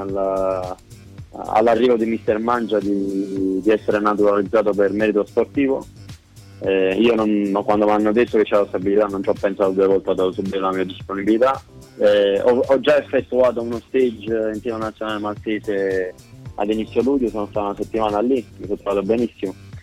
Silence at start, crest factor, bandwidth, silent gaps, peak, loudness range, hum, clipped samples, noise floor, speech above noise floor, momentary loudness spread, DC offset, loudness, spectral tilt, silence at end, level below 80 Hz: 0 s; 14 dB; 12.5 kHz; none; -6 dBFS; 4 LU; none; under 0.1%; -41 dBFS; 22 dB; 9 LU; under 0.1%; -19 LUFS; -6.5 dB/octave; 0 s; -50 dBFS